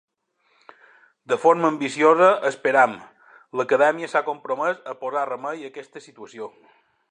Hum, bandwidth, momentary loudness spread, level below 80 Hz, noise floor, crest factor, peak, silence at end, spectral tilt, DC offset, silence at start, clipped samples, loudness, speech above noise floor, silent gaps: none; 10 kHz; 21 LU; -80 dBFS; -67 dBFS; 20 dB; -2 dBFS; 0.6 s; -5 dB/octave; under 0.1%; 1.3 s; under 0.1%; -21 LUFS; 46 dB; none